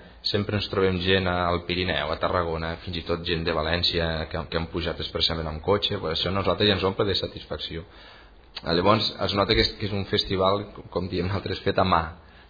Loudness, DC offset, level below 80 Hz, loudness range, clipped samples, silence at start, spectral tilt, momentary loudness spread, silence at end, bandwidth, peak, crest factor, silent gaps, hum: -25 LUFS; under 0.1%; -42 dBFS; 2 LU; under 0.1%; 0 s; -6.5 dB/octave; 11 LU; 0.1 s; 5 kHz; -6 dBFS; 20 dB; none; none